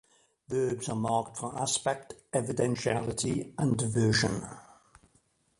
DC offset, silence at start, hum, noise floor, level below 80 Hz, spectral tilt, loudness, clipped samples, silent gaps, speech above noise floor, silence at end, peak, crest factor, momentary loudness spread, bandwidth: under 0.1%; 0.5 s; none; -69 dBFS; -58 dBFS; -4.5 dB/octave; -30 LUFS; under 0.1%; none; 39 dB; 0.95 s; -10 dBFS; 20 dB; 10 LU; 11.5 kHz